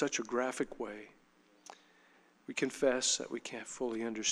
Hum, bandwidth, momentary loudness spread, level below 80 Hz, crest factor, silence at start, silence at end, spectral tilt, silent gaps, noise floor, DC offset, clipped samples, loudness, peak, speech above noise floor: none; 13.5 kHz; 24 LU; -70 dBFS; 20 dB; 0 s; 0 s; -2 dB/octave; none; -66 dBFS; under 0.1%; under 0.1%; -35 LUFS; -16 dBFS; 30 dB